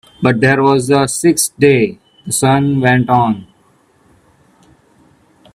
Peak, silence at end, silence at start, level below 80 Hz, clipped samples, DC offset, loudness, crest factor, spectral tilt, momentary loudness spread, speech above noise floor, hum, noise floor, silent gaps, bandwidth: 0 dBFS; 2.1 s; 0.2 s; -50 dBFS; under 0.1%; under 0.1%; -13 LUFS; 14 dB; -5 dB/octave; 8 LU; 41 dB; none; -53 dBFS; none; 15.5 kHz